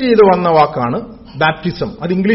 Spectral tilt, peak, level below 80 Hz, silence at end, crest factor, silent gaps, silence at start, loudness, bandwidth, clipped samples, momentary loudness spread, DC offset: -5 dB/octave; 0 dBFS; -42 dBFS; 0 s; 14 dB; none; 0 s; -14 LUFS; 5.8 kHz; under 0.1%; 12 LU; under 0.1%